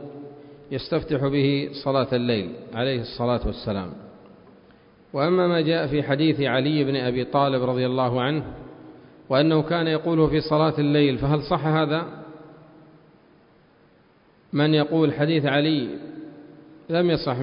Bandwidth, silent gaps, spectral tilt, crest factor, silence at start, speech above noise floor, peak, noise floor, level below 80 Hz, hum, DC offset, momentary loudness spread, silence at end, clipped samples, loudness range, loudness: 5.4 kHz; none; -11.5 dB/octave; 18 dB; 0 s; 35 dB; -6 dBFS; -57 dBFS; -48 dBFS; none; under 0.1%; 16 LU; 0 s; under 0.1%; 5 LU; -23 LUFS